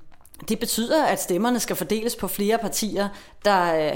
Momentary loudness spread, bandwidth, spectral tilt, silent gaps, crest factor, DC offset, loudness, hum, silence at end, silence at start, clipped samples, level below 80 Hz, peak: 7 LU; 17 kHz; -3.5 dB/octave; none; 16 dB; under 0.1%; -23 LUFS; none; 0 s; 0 s; under 0.1%; -50 dBFS; -6 dBFS